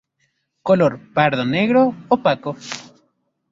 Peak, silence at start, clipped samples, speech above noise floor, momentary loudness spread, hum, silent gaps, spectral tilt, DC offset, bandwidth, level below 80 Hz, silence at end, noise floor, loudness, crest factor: -2 dBFS; 0.65 s; under 0.1%; 51 dB; 14 LU; none; none; -6 dB/octave; under 0.1%; 7.8 kHz; -60 dBFS; 0.7 s; -68 dBFS; -18 LUFS; 18 dB